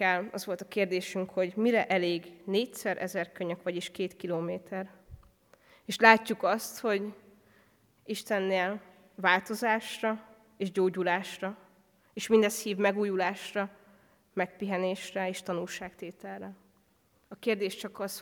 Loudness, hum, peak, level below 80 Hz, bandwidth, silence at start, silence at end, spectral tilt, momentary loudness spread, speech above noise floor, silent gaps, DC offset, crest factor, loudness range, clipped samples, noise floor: -30 LUFS; none; -4 dBFS; -72 dBFS; 19.5 kHz; 0 s; 0 s; -4.5 dB/octave; 14 LU; 38 dB; none; under 0.1%; 28 dB; 8 LU; under 0.1%; -68 dBFS